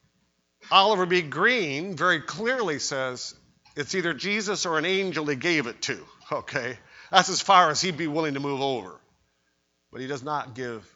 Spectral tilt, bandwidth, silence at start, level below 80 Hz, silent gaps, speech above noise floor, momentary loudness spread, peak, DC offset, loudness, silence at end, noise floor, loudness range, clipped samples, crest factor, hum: -3 dB/octave; 8 kHz; 0.65 s; -68 dBFS; none; 47 dB; 16 LU; 0 dBFS; under 0.1%; -24 LUFS; 0.15 s; -72 dBFS; 3 LU; under 0.1%; 26 dB; none